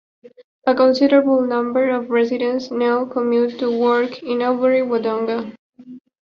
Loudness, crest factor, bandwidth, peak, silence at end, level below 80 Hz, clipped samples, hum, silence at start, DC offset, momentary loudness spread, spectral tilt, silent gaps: -18 LUFS; 16 dB; 6.8 kHz; -2 dBFS; 0.3 s; -66 dBFS; under 0.1%; none; 0.65 s; under 0.1%; 8 LU; -6 dB/octave; 5.59-5.73 s